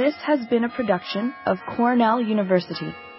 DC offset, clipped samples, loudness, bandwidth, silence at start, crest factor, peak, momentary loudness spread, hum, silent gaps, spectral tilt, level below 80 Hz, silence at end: under 0.1%; under 0.1%; -22 LUFS; 5.8 kHz; 0 s; 16 dB; -6 dBFS; 7 LU; none; none; -10.5 dB/octave; -62 dBFS; 0 s